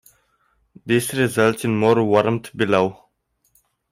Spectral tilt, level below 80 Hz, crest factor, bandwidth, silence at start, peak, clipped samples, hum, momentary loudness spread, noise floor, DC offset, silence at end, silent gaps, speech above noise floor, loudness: -5.5 dB/octave; -58 dBFS; 18 dB; 16 kHz; 0.85 s; -4 dBFS; under 0.1%; none; 6 LU; -68 dBFS; under 0.1%; 1 s; none; 49 dB; -19 LUFS